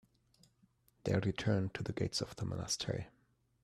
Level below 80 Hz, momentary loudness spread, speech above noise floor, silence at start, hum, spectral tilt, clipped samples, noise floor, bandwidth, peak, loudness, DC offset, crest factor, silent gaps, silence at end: -62 dBFS; 8 LU; 36 dB; 1.05 s; none; -5 dB/octave; under 0.1%; -72 dBFS; 14 kHz; -20 dBFS; -38 LUFS; under 0.1%; 18 dB; none; 0.55 s